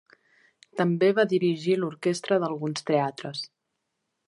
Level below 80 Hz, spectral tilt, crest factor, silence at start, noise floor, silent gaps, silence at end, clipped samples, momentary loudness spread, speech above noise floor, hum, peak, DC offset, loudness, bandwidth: -78 dBFS; -6 dB/octave; 18 dB; 0.75 s; -80 dBFS; none; 0.8 s; under 0.1%; 13 LU; 55 dB; none; -10 dBFS; under 0.1%; -26 LUFS; 11.5 kHz